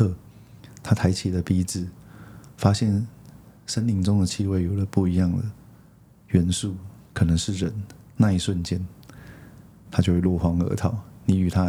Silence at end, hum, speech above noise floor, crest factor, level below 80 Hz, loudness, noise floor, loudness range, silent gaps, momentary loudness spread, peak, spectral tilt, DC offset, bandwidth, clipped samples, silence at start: 0 s; none; 30 dB; 22 dB; -48 dBFS; -24 LUFS; -52 dBFS; 2 LU; none; 17 LU; -2 dBFS; -6.5 dB/octave; under 0.1%; 14 kHz; under 0.1%; 0 s